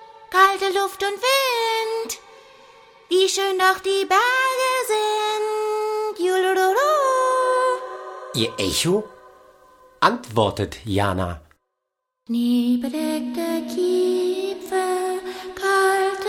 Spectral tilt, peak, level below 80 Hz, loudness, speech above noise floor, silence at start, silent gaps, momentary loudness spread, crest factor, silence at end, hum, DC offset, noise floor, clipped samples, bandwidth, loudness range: -3.5 dB/octave; 0 dBFS; -54 dBFS; -21 LUFS; 59 dB; 0 s; none; 9 LU; 20 dB; 0 s; none; under 0.1%; -80 dBFS; under 0.1%; 18 kHz; 4 LU